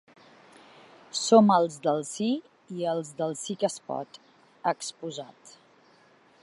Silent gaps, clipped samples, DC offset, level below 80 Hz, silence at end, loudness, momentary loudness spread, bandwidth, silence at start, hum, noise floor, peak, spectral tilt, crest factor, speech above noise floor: none; under 0.1%; under 0.1%; -82 dBFS; 0.95 s; -27 LUFS; 18 LU; 11.5 kHz; 1.15 s; none; -60 dBFS; -6 dBFS; -5 dB/octave; 24 dB; 33 dB